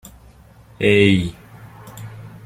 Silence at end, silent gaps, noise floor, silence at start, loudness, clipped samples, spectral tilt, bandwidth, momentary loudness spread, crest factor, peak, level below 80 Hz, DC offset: 0.15 s; none; -46 dBFS; 0.8 s; -16 LUFS; under 0.1%; -6.5 dB/octave; 15.5 kHz; 23 LU; 20 dB; -2 dBFS; -48 dBFS; under 0.1%